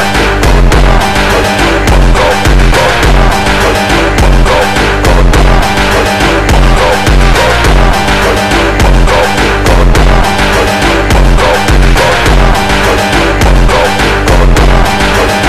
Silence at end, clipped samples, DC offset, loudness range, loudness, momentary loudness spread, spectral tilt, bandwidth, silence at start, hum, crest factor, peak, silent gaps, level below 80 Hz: 0 s; under 0.1%; 7%; 0 LU; -7 LUFS; 1 LU; -4.5 dB/octave; 14.5 kHz; 0 s; none; 6 dB; 0 dBFS; none; -10 dBFS